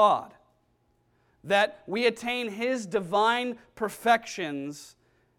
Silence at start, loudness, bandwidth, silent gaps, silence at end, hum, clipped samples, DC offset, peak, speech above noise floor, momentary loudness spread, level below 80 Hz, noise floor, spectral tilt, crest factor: 0 s; -27 LUFS; 17.5 kHz; none; 0.5 s; none; under 0.1%; under 0.1%; -8 dBFS; 42 dB; 10 LU; -70 dBFS; -69 dBFS; -3.5 dB/octave; 20 dB